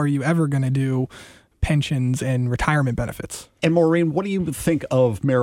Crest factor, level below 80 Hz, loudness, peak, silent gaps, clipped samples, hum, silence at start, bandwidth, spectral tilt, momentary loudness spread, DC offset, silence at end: 16 dB; -40 dBFS; -21 LUFS; -4 dBFS; none; under 0.1%; none; 0 s; 15.5 kHz; -6.5 dB/octave; 9 LU; under 0.1%; 0 s